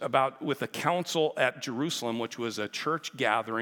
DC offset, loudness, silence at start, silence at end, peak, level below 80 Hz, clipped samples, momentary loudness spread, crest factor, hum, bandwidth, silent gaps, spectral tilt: under 0.1%; -30 LUFS; 0 s; 0 s; -8 dBFS; -84 dBFS; under 0.1%; 6 LU; 22 dB; none; 18 kHz; none; -4 dB/octave